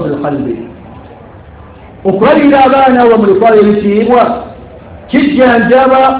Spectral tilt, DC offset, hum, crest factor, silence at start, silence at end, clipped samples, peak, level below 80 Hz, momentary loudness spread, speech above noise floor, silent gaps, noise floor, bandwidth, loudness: -10 dB/octave; under 0.1%; none; 8 dB; 0 s; 0 s; 3%; 0 dBFS; -38 dBFS; 12 LU; 25 dB; none; -32 dBFS; 4 kHz; -8 LUFS